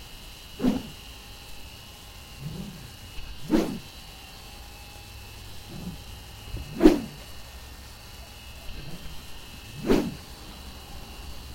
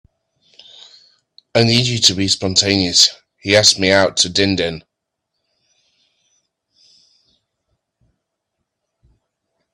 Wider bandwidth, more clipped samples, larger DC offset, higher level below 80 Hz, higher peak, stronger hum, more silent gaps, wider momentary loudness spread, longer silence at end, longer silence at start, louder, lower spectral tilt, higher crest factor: about the same, 16 kHz vs 16 kHz; neither; neither; first, -42 dBFS vs -54 dBFS; about the same, -2 dBFS vs 0 dBFS; neither; neither; first, 18 LU vs 10 LU; second, 0 s vs 4.95 s; second, 0 s vs 1.55 s; second, -29 LUFS vs -13 LUFS; first, -5.5 dB/octave vs -3 dB/octave; first, 30 dB vs 20 dB